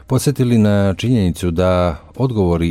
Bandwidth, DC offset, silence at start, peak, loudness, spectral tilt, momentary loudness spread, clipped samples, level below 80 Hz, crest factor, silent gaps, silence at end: 16 kHz; under 0.1%; 0.1 s; -2 dBFS; -16 LUFS; -7 dB/octave; 6 LU; under 0.1%; -34 dBFS; 12 dB; none; 0 s